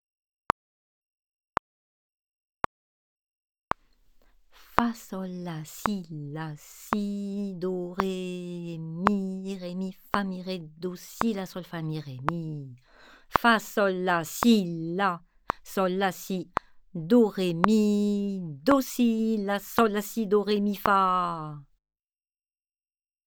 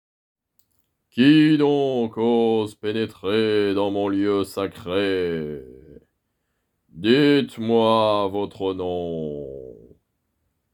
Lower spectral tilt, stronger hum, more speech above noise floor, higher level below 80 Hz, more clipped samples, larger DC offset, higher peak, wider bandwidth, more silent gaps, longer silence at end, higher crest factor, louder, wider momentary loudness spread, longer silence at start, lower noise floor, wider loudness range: second, -5.5 dB/octave vs -7 dB/octave; neither; first, over 63 dB vs 54 dB; about the same, -58 dBFS vs -60 dBFS; neither; neither; first, 0 dBFS vs -4 dBFS; first, over 20 kHz vs 13.5 kHz; neither; first, 1.65 s vs 1 s; first, 28 dB vs 18 dB; second, -28 LUFS vs -21 LUFS; about the same, 14 LU vs 13 LU; first, 4.7 s vs 1.15 s; first, under -90 dBFS vs -74 dBFS; first, 10 LU vs 5 LU